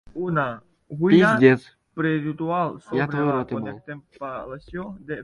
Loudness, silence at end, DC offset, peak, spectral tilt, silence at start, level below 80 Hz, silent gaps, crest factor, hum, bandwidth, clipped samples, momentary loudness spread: -22 LUFS; 0 s; under 0.1%; -2 dBFS; -8 dB/octave; 0.15 s; -56 dBFS; none; 22 dB; none; 11.5 kHz; under 0.1%; 20 LU